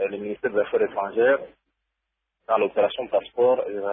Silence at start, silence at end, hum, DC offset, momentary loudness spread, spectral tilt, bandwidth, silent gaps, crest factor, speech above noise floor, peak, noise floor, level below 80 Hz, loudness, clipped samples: 0 s; 0 s; none; under 0.1%; 5 LU; -9 dB/octave; 3.8 kHz; none; 16 dB; 58 dB; -8 dBFS; -81 dBFS; -66 dBFS; -23 LUFS; under 0.1%